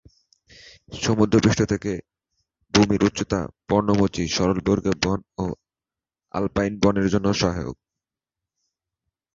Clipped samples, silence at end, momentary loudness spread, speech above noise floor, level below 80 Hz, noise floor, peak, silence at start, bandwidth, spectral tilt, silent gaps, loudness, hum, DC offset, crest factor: under 0.1%; 1.6 s; 12 LU; over 69 dB; -44 dBFS; under -90 dBFS; -2 dBFS; 0.9 s; 7.8 kHz; -5.5 dB/octave; none; -22 LUFS; none; under 0.1%; 22 dB